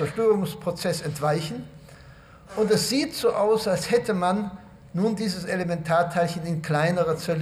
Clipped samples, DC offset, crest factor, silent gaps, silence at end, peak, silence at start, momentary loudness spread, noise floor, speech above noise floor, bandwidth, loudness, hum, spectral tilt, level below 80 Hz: under 0.1%; under 0.1%; 16 dB; none; 0 s; -8 dBFS; 0 s; 10 LU; -48 dBFS; 24 dB; 15.5 kHz; -25 LUFS; none; -5.5 dB/octave; -56 dBFS